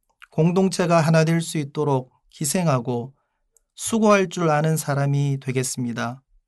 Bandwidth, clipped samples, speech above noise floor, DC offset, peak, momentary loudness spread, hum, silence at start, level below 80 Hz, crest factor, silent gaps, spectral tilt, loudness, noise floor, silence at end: 12.5 kHz; under 0.1%; 46 dB; under 0.1%; -4 dBFS; 11 LU; none; 0.35 s; -64 dBFS; 18 dB; none; -5.5 dB/octave; -22 LUFS; -67 dBFS; 0.3 s